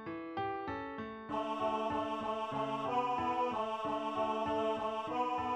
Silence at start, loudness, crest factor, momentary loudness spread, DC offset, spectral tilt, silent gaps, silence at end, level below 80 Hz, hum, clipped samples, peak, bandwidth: 0 s; -36 LUFS; 14 dB; 6 LU; under 0.1%; -6 dB/octave; none; 0 s; -66 dBFS; none; under 0.1%; -22 dBFS; 11 kHz